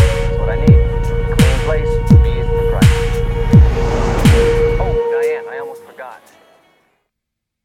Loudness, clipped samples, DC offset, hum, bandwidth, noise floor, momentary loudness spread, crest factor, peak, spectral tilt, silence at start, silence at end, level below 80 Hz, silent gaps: -14 LUFS; under 0.1%; under 0.1%; none; 16 kHz; -78 dBFS; 16 LU; 14 dB; 0 dBFS; -7 dB/octave; 0 s; 1.5 s; -18 dBFS; none